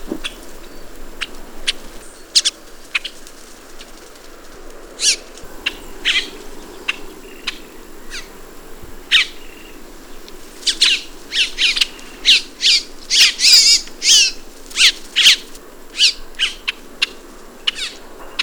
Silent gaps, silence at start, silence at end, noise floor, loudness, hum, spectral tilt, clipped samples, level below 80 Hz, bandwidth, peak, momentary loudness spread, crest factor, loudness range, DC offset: none; 0 s; 0 s; -37 dBFS; -14 LUFS; none; 2 dB/octave; under 0.1%; -40 dBFS; over 20 kHz; -2 dBFS; 19 LU; 18 dB; 12 LU; under 0.1%